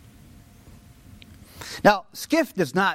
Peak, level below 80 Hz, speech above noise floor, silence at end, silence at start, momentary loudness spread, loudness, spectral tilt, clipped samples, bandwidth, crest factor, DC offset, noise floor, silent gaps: -4 dBFS; -54 dBFS; 28 dB; 0 s; 1.55 s; 15 LU; -22 LUFS; -4.5 dB/octave; under 0.1%; 16.5 kHz; 22 dB; under 0.1%; -49 dBFS; none